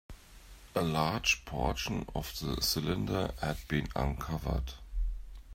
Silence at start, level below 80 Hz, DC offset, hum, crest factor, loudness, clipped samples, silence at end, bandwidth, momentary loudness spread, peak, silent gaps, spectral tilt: 0.1 s; -42 dBFS; under 0.1%; none; 20 dB; -34 LUFS; under 0.1%; 0 s; 16 kHz; 11 LU; -14 dBFS; none; -4.5 dB/octave